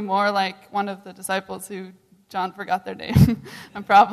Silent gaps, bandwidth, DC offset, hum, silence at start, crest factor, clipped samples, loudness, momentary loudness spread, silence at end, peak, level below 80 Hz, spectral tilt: none; 14 kHz; under 0.1%; none; 0 s; 18 dB; under 0.1%; -22 LUFS; 18 LU; 0 s; -4 dBFS; -40 dBFS; -6 dB/octave